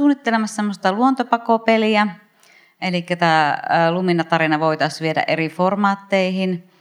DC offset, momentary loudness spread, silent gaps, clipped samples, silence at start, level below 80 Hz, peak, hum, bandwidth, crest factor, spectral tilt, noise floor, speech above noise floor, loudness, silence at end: under 0.1%; 7 LU; none; under 0.1%; 0 s; -76 dBFS; 0 dBFS; none; 12.5 kHz; 18 dB; -6 dB/octave; -53 dBFS; 34 dB; -18 LUFS; 0.2 s